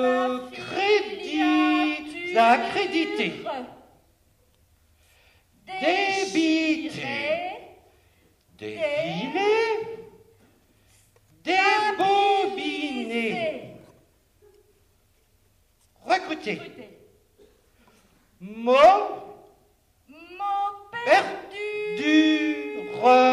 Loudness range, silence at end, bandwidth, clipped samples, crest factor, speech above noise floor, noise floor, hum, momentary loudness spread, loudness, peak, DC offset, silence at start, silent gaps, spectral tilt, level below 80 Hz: 10 LU; 0 s; 12 kHz; under 0.1%; 18 dB; 42 dB; -63 dBFS; none; 17 LU; -23 LUFS; -6 dBFS; under 0.1%; 0 s; none; -4 dB/octave; -64 dBFS